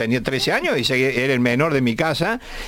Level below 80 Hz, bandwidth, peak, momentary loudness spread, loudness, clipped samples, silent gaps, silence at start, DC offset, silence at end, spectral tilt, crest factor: -42 dBFS; 17 kHz; -6 dBFS; 3 LU; -19 LUFS; under 0.1%; none; 0 s; under 0.1%; 0 s; -5 dB/octave; 14 dB